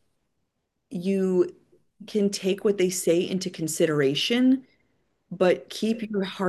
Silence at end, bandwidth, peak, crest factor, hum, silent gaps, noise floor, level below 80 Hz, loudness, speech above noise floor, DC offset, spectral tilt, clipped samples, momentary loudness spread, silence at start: 0 s; 12.5 kHz; -8 dBFS; 16 dB; none; none; -78 dBFS; -72 dBFS; -25 LUFS; 54 dB; under 0.1%; -5 dB/octave; under 0.1%; 8 LU; 0.9 s